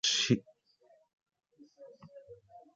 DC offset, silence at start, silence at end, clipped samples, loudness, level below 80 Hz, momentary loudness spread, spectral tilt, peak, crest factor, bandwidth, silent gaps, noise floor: under 0.1%; 0.05 s; 0.15 s; under 0.1%; -30 LUFS; -72 dBFS; 27 LU; -3 dB/octave; -14 dBFS; 24 dB; 9.6 kHz; 1.13-1.26 s; -67 dBFS